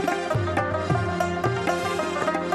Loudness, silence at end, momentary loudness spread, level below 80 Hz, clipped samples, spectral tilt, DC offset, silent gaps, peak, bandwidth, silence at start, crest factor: -25 LUFS; 0 s; 1 LU; -50 dBFS; under 0.1%; -6 dB/octave; under 0.1%; none; -8 dBFS; 13 kHz; 0 s; 16 dB